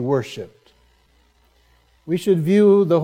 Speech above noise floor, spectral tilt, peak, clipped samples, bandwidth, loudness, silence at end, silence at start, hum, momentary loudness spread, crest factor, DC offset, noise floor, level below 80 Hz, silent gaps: 41 dB; -8 dB/octave; -4 dBFS; under 0.1%; 15 kHz; -17 LUFS; 0 s; 0 s; none; 20 LU; 16 dB; under 0.1%; -58 dBFS; -62 dBFS; none